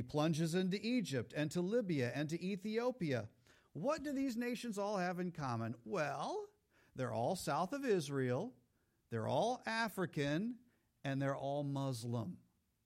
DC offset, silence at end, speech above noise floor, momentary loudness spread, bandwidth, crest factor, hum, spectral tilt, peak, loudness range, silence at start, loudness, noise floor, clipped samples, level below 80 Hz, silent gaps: under 0.1%; 0.5 s; 39 dB; 8 LU; 16 kHz; 16 dB; none; -6 dB/octave; -24 dBFS; 2 LU; 0 s; -40 LUFS; -78 dBFS; under 0.1%; -74 dBFS; none